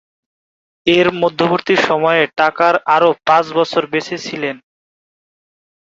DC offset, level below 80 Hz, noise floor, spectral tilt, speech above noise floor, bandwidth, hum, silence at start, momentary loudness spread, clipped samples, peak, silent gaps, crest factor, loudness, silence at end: under 0.1%; -58 dBFS; under -90 dBFS; -5 dB/octave; over 76 dB; 7.8 kHz; none; 0.85 s; 10 LU; under 0.1%; 0 dBFS; none; 16 dB; -15 LUFS; 1.35 s